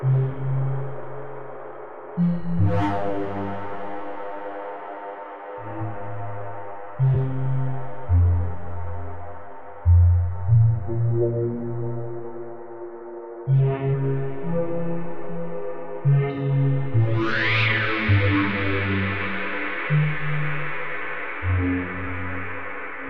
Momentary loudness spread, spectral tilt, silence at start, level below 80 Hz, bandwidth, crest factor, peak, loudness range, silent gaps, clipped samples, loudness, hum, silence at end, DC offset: 16 LU; -9 dB/octave; 0 s; -44 dBFS; 5.6 kHz; 16 dB; -8 dBFS; 7 LU; none; under 0.1%; -24 LUFS; none; 0 s; 3%